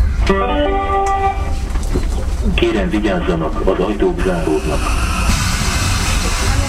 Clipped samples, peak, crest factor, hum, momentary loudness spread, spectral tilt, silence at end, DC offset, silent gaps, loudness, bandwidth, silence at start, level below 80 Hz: under 0.1%; 0 dBFS; 16 dB; none; 5 LU; -5 dB/octave; 0 s; under 0.1%; none; -17 LUFS; 15.5 kHz; 0 s; -18 dBFS